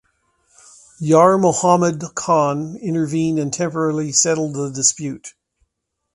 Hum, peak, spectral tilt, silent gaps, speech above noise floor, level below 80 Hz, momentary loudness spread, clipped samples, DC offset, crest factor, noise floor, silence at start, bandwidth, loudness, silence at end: none; 0 dBFS; -4.5 dB/octave; none; 59 dB; -60 dBFS; 12 LU; under 0.1%; under 0.1%; 18 dB; -76 dBFS; 1 s; 11.5 kHz; -17 LUFS; 0.85 s